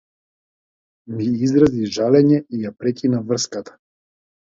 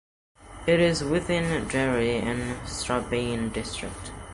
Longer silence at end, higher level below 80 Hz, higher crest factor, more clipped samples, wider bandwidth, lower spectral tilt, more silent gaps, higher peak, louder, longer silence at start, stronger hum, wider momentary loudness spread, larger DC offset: first, 0.9 s vs 0 s; second, -52 dBFS vs -44 dBFS; about the same, 18 dB vs 16 dB; neither; second, 7.8 kHz vs 11.5 kHz; about the same, -6 dB/octave vs -5 dB/octave; neither; first, -2 dBFS vs -10 dBFS; first, -18 LUFS vs -26 LUFS; first, 1.1 s vs 0.4 s; neither; about the same, 12 LU vs 11 LU; neither